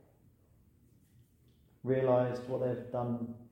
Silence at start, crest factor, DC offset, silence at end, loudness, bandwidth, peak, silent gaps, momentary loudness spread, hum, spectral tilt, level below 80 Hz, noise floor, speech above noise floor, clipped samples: 1.85 s; 20 dB; under 0.1%; 0.05 s; -34 LUFS; 16 kHz; -16 dBFS; none; 9 LU; none; -9 dB/octave; -70 dBFS; -66 dBFS; 33 dB; under 0.1%